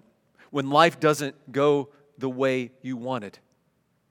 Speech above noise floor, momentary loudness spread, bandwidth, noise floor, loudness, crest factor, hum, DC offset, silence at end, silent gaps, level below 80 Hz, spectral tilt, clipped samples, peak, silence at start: 45 dB; 14 LU; 17.5 kHz; -70 dBFS; -25 LUFS; 24 dB; none; under 0.1%; 0.8 s; none; -80 dBFS; -5 dB/octave; under 0.1%; -2 dBFS; 0.55 s